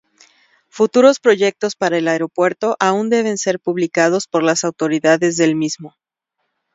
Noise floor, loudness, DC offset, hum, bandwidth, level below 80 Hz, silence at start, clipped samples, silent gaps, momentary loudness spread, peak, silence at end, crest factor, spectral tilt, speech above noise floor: -74 dBFS; -16 LUFS; under 0.1%; none; 7.8 kHz; -66 dBFS; 0.75 s; under 0.1%; none; 8 LU; 0 dBFS; 0.85 s; 16 dB; -4 dB/octave; 58 dB